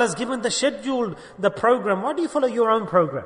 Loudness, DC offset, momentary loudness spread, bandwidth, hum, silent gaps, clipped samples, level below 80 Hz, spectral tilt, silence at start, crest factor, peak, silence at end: -22 LUFS; under 0.1%; 6 LU; 10.5 kHz; none; none; under 0.1%; -60 dBFS; -4 dB/octave; 0 s; 16 dB; -6 dBFS; 0 s